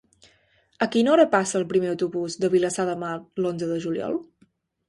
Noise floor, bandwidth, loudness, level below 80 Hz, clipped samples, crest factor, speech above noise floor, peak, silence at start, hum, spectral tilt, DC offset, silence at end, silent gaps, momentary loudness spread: -63 dBFS; 11.5 kHz; -24 LUFS; -66 dBFS; under 0.1%; 20 dB; 40 dB; -4 dBFS; 0.8 s; none; -5 dB/octave; under 0.1%; 0.65 s; none; 11 LU